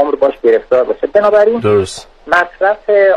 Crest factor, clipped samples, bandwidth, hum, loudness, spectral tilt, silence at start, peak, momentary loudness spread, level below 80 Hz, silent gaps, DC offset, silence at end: 12 dB; under 0.1%; 11.5 kHz; none; -12 LUFS; -5.5 dB/octave; 0 s; 0 dBFS; 5 LU; -46 dBFS; none; under 0.1%; 0 s